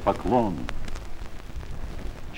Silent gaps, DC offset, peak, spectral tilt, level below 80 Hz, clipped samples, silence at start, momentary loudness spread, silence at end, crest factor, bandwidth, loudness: none; under 0.1%; -6 dBFS; -7 dB/octave; -34 dBFS; under 0.1%; 0 s; 17 LU; 0 s; 20 dB; 12.5 kHz; -29 LUFS